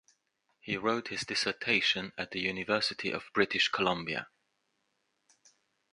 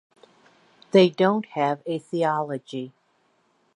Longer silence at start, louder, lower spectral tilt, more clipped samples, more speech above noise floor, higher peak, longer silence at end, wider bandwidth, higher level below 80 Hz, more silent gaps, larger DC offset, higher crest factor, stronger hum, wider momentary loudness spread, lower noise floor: second, 0.65 s vs 0.95 s; second, -31 LUFS vs -23 LUFS; second, -3 dB/octave vs -7 dB/octave; neither; about the same, 47 dB vs 44 dB; second, -10 dBFS vs -6 dBFS; first, 1.65 s vs 0.9 s; about the same, 11 kHz vs 10.5 kHz; first, -68 dBFS vs -78 dBFS; neither; neither; about the same, 24 dB vs 20 dB; neither; second, 10 LU vs 16 LU; first, -79 dBFS vs -66 dBFS